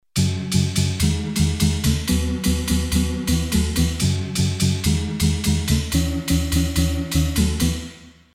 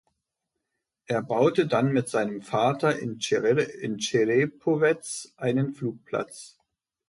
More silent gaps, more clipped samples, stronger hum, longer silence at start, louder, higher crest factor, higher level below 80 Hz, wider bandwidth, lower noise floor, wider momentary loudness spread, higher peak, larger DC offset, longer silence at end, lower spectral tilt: neither; neither; neither; second, 0.15 s vs 1.1 s; first, -21 LUFS vs -26 LUFS; about the same, 16 dB vs 18 dB; first, -28 dBFS vs -70 dBFS; first, 16.5 kHz vs 11.5 kHz; second, -40 dBFS vs -83 dBFS; second, 2 LU vs 9 LU; first, -4 dBFS vs -10 dBFS; neither; second, 0.25 s vs 0.6 s; about the same, -5 dB/octave vs -5.5 dB/octave